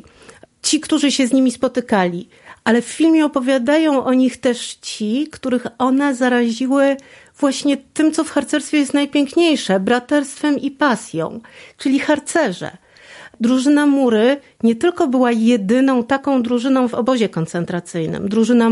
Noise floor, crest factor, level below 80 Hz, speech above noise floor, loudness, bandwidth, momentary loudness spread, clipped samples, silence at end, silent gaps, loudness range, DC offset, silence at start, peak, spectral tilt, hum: -45 dBFS; 14 dB; -58 dBFS; 29 dB; -17 LUFS; 11.5 kHz; 8 LU; under 0.1%; 0 s; none; 3 LU; under 0.1%; 0.65 s; -2 dBFS; -4.5 dB/octave; none